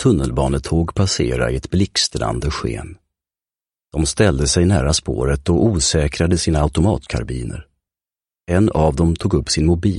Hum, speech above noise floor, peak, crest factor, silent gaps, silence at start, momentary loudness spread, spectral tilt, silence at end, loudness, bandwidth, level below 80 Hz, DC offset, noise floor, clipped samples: none; over 73 dB; 0 dBFS; 16 dB; none; 0 s; 9 LU; -5 dB/octave; 0 s; -18 LUFS; 11.5 kHz; -28 dBFS; under 0.1%; under -90 dBFS; under 0.1%